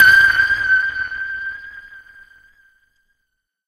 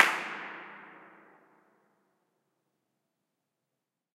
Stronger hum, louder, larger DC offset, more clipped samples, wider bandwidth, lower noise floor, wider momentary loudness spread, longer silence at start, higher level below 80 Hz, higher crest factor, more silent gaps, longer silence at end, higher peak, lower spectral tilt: neither; first, -15 LUFS vs -32 LUFS; neither; neither; about the same, 15 kHz vs 15.5 kHz; second, -74 dBFS vs -87 dBFS; about the same, 23 LU vs 24 LU; about the same, 0 s vs 0 s; first, -50 dBFS vs under -90 dBFS; second, 18 dB vs 36 dB; neither; second, 1.7 s vs 3.2 s; about the same, 0 dBFS vs -2 dBFS; about the same, -1 dB/octave vs -1 dB/octave